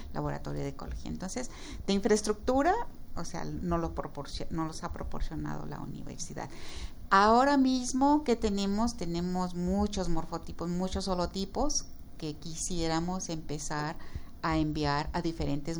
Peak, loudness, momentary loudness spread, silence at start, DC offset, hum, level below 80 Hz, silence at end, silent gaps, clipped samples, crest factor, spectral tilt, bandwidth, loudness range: -10 dBFS; -32 LUFS; 14 LU; 0 s; under 0.1%; none; -42 dBFS; 0 s; none; under 0.1%; 20 dB; -5 dB/octave; over 20 kHz; 9 LU